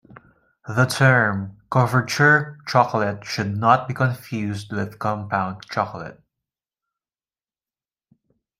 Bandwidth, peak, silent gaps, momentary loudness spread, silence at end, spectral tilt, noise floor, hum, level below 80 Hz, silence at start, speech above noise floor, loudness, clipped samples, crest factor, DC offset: 15.5 kHz; -2 dBFS; none; 12 LU; 2.45 s; -6 dB/octave; under -90 dBFS; none; -60 dBFS; 0.65 s; over 69 dB; -21 LUFS; under 0.1%; 20 dB; under 0.1%